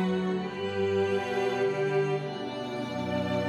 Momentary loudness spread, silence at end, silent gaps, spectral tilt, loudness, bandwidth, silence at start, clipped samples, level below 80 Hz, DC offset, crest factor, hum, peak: 7 LU; 0 s; none; -6.5 dB/octave; -30 LUFS; 11 kHz; 0 s; under 0.1%; -68 dBFS; under 0.1%; 12 dB; none; -16 dBFS